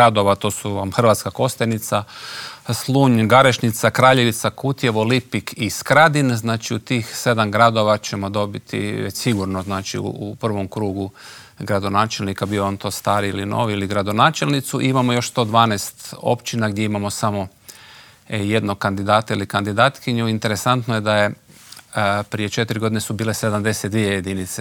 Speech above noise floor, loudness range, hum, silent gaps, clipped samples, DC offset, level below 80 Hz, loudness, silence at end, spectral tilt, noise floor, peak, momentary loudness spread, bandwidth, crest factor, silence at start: 26 dB; 6 LU; none; none; under 0.1%; under 0.1%; -60 dBFS; -19 LUFS; 0 s; -5 dB/octave; -45 dBFS; 0 dBFS; 11 LU; 19.5 kHz; 18 dB; 0 s